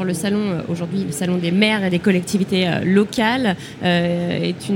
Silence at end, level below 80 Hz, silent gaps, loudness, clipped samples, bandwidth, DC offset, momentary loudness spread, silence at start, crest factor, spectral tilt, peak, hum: 0 s; -56 dBFS; none; -19 LUFS; under 0.1%; 17 kHz; under 0.1%; 6 LU; 0 s; 16 dB; -5.5 dB/octave; -2 dBFS; none